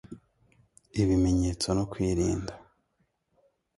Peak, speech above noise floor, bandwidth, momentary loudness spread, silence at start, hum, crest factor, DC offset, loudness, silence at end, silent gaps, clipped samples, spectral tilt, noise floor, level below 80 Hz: -12 dBFS; 48 dB; 11.5 kHz; 13 LU; 0.1 s; none; 18 dB; under 0.1%; -28 LUFS; 1.2 s; none; under 0.1%; -6 dB/octave; -75 dBFS; -42 dBFS